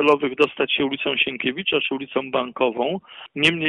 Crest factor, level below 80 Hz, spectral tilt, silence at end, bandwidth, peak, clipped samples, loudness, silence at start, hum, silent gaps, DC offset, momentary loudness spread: 18 dB; -62 dBFS; -5 dB/octave; 0 s; 11 kHz; -4 dBFS; under 0.1%; -22 LUFS; 0 s; none; none; under 0.1%; 7 LU